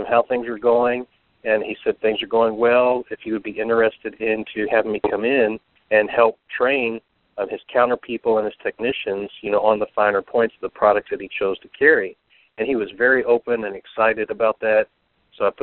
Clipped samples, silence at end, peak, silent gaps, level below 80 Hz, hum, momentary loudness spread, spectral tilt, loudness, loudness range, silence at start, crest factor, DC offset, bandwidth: under 0.1%; 0.1 s; -2 dBFS; none; -60 dBFS; none; 10 LU; -2 dB/octave; -20 LUFS; 2 LU; 0 s; 20 dB; under 0.1%; 4.3 kHz